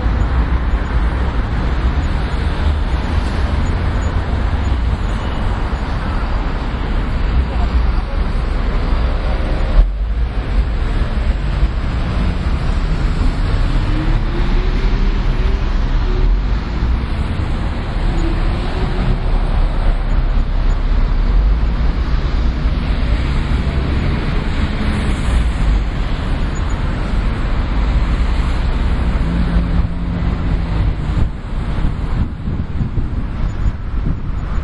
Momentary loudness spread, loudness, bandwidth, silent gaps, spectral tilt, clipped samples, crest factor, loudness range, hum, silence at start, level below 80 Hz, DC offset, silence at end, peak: 3 LU; -19 LUFS; 8.4 kHz; none; -7.5 dB/octave; under 0.1%; 14 dB; 1 LU; none; 0 s; -16 dBFS; under 0.1%; 0 s; 0 dBFS